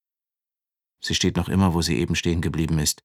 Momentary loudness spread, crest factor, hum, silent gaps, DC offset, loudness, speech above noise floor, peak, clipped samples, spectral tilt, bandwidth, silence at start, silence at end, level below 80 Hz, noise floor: 4 LU; 16 dB; none; none; under 0.1%; -22 LUFS; over 68 dB; -6 dBFS; under 0.1%; -4.5 dB/octave; 16.5 kHz; 1 s; 0.1 s; -40 dBFS; under -90 dBFS